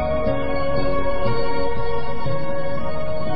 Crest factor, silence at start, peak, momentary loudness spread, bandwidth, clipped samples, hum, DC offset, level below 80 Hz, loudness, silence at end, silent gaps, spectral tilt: 14 dB; 0 s; -6 dBFS; 5 LU; 5.8 kHz; under 0.1%; none; 20%; -34 dBFS; -24 LUFS; 0 s; none; -11.5 dB/octave